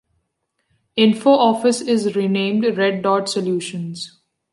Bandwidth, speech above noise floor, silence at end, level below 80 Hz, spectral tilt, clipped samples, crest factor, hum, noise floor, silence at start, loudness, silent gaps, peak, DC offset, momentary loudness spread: 11.5 kHz; 55 dB; 0.45 s; -68 dBFS; -5 dB/octave; under 0.1%; 16 dB; none; -73 dBFS; 0.95 s; -18 LUFS; none; -2 dBFS; under 0.1%; 13 LU